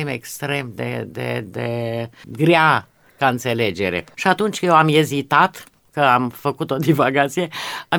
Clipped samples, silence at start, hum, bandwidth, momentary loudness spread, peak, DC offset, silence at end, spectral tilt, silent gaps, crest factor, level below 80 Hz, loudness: under 0.1%; 0 s; none; 20 kHz; 12 LU; -2 dBFS; under 0.1%; 0 s; -5.5 dB/octave; none; 18 dB; -60 dBFS; -19 LUFS